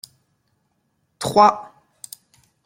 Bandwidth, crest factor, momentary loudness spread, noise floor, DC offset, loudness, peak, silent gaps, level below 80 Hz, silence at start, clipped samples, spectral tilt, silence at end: 16.5 kHz; 20 dB; 26 LU; -69 dBFS; under 0.1%; -17 LUFS; -2 dBFS; none; -62 dBFS; 1.2 s; under 0.1%; -4 dB/octave; 1.05 s